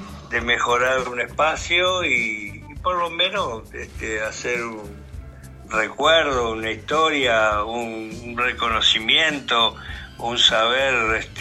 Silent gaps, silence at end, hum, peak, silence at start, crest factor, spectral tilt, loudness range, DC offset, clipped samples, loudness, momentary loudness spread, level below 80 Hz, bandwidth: none; 0 s; none; -2 dBFS; 0 s; 20 dB; -2.5 dB/octave; 6 LU; under 0.1%; under 0.1%; -20 LUFS; 15 LU; -44 dBFS; 14.5 kHz